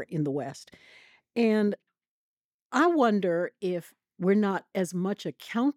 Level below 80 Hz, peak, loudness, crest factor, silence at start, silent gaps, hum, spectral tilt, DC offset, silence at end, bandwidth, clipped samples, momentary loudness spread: -80 dBFS; -12 dBFS; -28 LUFS; 18 dB; 0 s; 2.08-2.37 s, 2.45-2.70 s; none; -6.5 dB/octave; under 0.1%; 0.05 s; 14.5 kHz; under 0.1%; 12 LU